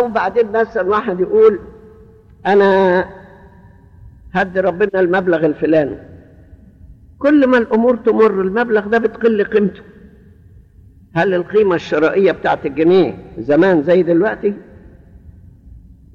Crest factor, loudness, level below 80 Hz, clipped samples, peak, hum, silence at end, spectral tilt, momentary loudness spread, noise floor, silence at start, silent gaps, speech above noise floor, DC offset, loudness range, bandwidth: 12 dB; -15 LUFS; -46 dBFS; under 0.1%; -2 dBFS; none; 0.35 s; -8 dB/octave; 9 LU; -44 dBFS; 0 s; none; 31 dB; under 0.1%; 3 LU; 7 kHz